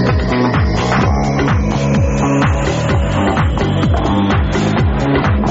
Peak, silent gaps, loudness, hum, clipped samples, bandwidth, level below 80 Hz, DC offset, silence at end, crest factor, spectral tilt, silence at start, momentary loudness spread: -2 dBFS; none; -14 LUFS; none; under 0.1%; 8 kHz; -20 dBFS; 0.5%; 0 s; 12 dB; -6 dB/octave; 0 s; 1 LU